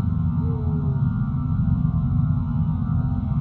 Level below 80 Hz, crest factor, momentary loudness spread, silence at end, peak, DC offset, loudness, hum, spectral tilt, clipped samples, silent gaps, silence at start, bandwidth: -32 dBFS; 12 dB; 2 LU; 0 s; -10 dBFS; under 0.1%; -23 LUFS; none; -13 dB/octave; under 0.1%; none; 0 s; 4 kHz